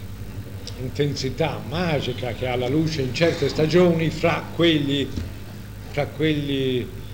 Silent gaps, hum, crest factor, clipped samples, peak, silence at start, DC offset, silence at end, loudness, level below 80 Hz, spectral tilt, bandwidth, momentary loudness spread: none; none; 18 dB; under 0.1%; -4 dBFS; 0 s; 0.8%; 0 s; -23 LUFS; -42 dBFS; -6 dB/octave; 16.5 kHz; 16 LU